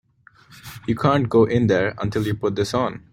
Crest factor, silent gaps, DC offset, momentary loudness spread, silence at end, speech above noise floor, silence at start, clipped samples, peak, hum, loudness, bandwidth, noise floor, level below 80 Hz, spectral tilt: 18 dB; none; under 0.1%; 9 LU; 0.15 s; 33 dB; 0.5 s; under 0.1%; -2 dBFS; none; -20 LUFS; 16.5 kHz; -52 dBFS; -50 dBFS; -7 dB/octave